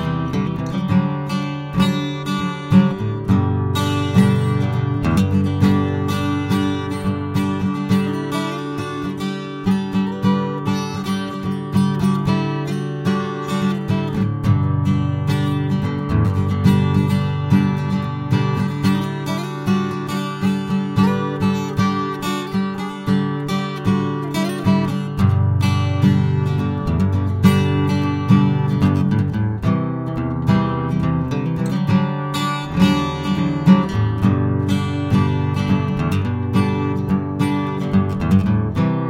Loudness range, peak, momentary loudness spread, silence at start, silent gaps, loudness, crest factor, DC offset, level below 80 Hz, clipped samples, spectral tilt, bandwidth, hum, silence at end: 3 LU; 0 dBFS; 7 LU; 0 s; none; -19 LUFS; 18 dB; under 0.1%; -40 dBFS; under 0.1%; -7.5 dB/octave; 15 kHz; none; 0 s